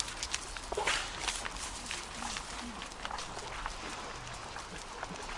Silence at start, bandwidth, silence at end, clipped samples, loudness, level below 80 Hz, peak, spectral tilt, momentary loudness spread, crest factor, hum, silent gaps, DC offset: 0 s; 11.5 kHz; 0 s; under 0.1%; -38 LUFS; -50 dBFS; -12 dBFS; -1.5 dB/octave; 10 LU; 28 dB; none; none; under 0.1%